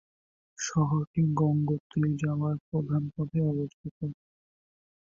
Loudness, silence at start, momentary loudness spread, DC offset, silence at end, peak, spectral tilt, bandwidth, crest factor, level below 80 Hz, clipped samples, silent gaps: -30 LUFS; 0.6 s; 11 LU; under 0.1%; 0.9 s; -14 dBFS; -7 dB/octave; 7.6 kHz; 16 dB; -60 dBFS; under 0.1%; 1.07-1.14 s, 1.80-1.90 s, 2.60-2.72 s, 3.74-3.84 s, 3.91-4.01 s